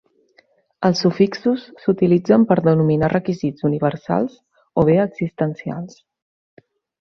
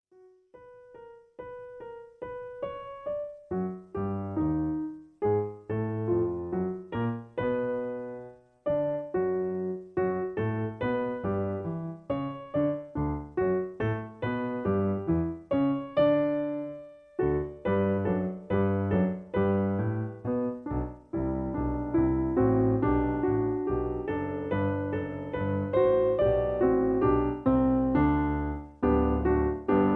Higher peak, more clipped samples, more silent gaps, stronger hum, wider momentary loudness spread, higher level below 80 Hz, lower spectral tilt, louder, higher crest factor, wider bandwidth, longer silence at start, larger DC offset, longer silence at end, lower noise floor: first, -2 dBFS vs -14 dBFS; neither; neither; neither; about the same, 10 LU vs 11 LU; second, -52 dBFS vs -44 dBFS; second, -8 dB/octave vs -11 dB/octave; first, -19 LUFS vs -29 LUFS; about the same, 18 dB vs 16 dB; first, 6.8 kHz vs 4.3 kHz; first, 0.8 s vs 0.55 s; neither; first, 1.15 s vs 0 s; about the same, -58 dBFS vs -59 dBFS